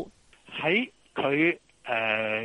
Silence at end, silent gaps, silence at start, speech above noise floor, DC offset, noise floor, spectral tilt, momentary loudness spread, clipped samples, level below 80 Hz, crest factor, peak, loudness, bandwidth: 0 s; none; 0 s; 25 dB; under 0.1%; -51 dBFS; -6 dB/octave; 13 LU; under 0.1%; -68 dBFS; 18 dB; -10 dBFS; -27 LUFS; 10.5 kHz